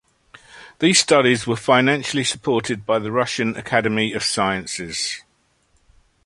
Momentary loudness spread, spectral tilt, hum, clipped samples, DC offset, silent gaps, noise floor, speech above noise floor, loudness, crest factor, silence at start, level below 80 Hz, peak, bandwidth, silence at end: 9 LU; -3.5 dB/octave; none; under 0.1%; under 0.1%; none; -63 dBFS; 44 dB; -19 LUFS; 20 dB; 0.55 s; -56 dBFS; 0 dBFS; 11.5 kHz; 1.05 s